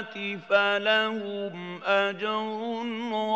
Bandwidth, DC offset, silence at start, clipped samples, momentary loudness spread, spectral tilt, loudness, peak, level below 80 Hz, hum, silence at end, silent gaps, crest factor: 8 kHz; under 0.1%; 0 s; under 0.1%; 11 LU; -5 dB/octave; -27 LUFS; -8 dBFS; -88 dBFS; none; 0 s; none; 20 dB